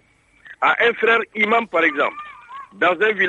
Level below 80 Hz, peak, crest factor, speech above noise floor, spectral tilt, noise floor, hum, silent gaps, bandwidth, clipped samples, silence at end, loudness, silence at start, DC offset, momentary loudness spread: -68 dBFS; -4 dBFS; 16 dB; 32 dB; -4.5 dB/octave; -50 dBFS; none; none; 8 kHz; under 0.1%; 0 s; -18 LUFS; 0.45 s; under 0.1%; 20 LU